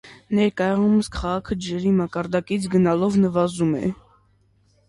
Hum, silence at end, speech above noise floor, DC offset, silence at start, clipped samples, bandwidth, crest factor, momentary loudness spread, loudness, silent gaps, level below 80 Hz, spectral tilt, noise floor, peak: none; 0.95 s; 40 dB; under 0.1%; 0.05 s; under 0.1%; 11.5 kHz; 14 dB; 7 LU; -22 LUFS; none; -44 dBFS; -7 dB/octave; -61 dBFS; -6 dBFS